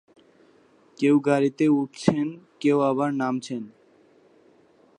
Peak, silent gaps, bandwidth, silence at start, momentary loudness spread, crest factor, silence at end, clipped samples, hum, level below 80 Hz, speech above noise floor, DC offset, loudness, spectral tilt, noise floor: -2 dBFS; none; 10 kHz; 1 s; 11 LU; 22 dB; 1.3 s; under 0.1%; none; -64 dBFS; 35 dB; under 0.1%; -24 LUFS; -7 dB/octave; -58 dBFS